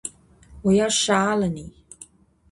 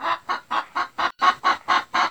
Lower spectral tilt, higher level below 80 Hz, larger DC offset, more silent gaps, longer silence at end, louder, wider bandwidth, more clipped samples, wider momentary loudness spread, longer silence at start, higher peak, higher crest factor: first, -4 dB/octave vs -1.5 dB/octave; first, -50 dBFS vs -66 dBFS; second, under 0.1% vs 0.1%; neither; first, 0.45 s vs 0 s; about the same, -21 LUFS vs -22 LUFS; second, 11.5 kHz vs over 20 kHz; neither; first, 17 LU vs 7 LU; about the same, 0.05 s vs 0 s; about the same, -8 dBFS vs -6 dBFS; about the same, 16 dB vs 18 dB